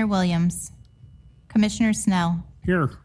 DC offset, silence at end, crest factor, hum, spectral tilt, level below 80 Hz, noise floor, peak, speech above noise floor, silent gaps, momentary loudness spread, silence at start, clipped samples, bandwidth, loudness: under 0.1%; 0.05 s; 14 dB; none; -5.5 dB/octave; -46 dBFS; -49 dBFS; -10 dBFS; 27 dB; none; 8 LU; 0 s; under 0.1%; 11 kHz; -23 LUFS